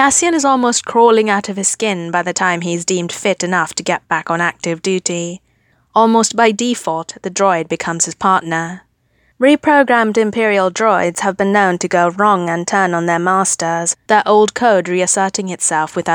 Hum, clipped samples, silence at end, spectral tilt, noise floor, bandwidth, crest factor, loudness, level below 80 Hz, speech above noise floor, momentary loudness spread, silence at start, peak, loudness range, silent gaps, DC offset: none; under 0.1%; 0 s; -3.5 dB/octave; -58 dBFS; 19 kHz; 14 dB; -14 LUFS; -60 dBFS; 44 dB; 7 LU; 0 s; 0 dBFS; 3 LU; none; under 0.1%